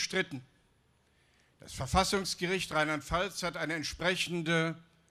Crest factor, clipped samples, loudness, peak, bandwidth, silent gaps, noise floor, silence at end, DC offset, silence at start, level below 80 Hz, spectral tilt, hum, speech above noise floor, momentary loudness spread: 20 dB; under 0.1%; -32 LUFS; -14 dBFS; 15 kHz; none; -70 dBFS; 0.3 s; under 0.1%; 0 s; -52 dBFS; -3.5 dB/octave; none; 37 dB; 10 LU